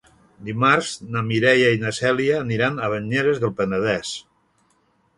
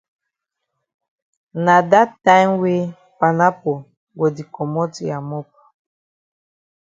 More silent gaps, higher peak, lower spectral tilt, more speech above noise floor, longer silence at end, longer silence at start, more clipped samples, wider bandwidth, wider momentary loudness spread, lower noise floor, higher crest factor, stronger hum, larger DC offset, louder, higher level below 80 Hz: second, none vs 3.97-4.07 s; about the same, -2 dBFS vs 0 dBFS; second, -5 dB/octave vs -6.5 dB/octave; second, 43 dB vs 63 dB; second, 0.95 s vs 1.4 s; second, 0.4 s vs 1.55 s; neither; first, 11.5 kHz vs 7.6 kHz; second, 10 LU vs 16 LU; second, -63 dBFS vs -80 dBFS; about the same, 20 dB vs 20 dB; neither; neither; second, -20 LUFS vs -17 LUFS; first, -56 dBFS vs -66 dBFS